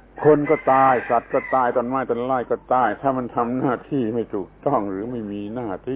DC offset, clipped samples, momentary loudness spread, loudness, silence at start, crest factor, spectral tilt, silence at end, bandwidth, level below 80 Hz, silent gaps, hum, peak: under 0.1%; under 0.1%; 12 LU; -21 LUFS; 0.15 s; 16 dB; -11 dB/octave; 0 s; 4 kHz; -52 dBFS; none; none; -4 dBFS